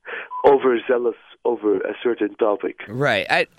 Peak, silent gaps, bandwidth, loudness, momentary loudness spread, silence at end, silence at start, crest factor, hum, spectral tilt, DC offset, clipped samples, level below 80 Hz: -2 dBFS; none; 11 kHz; -20 LUFS; 10 LU; 0.15 s; 0.05 s; 18 dB; none; -6 dB/octave; under 0.1%; under 0.1%; -62 dBFS